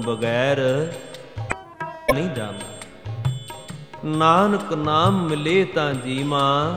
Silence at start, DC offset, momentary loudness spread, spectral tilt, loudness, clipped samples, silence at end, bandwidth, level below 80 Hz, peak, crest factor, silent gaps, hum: 0 s; 0.3%; 17 LU; -6 dB/octave; -21 LUFS; under 0.1%; 0 s; 16 kHz; -48 dBFS; -2 dBFS; 20 dB; none; none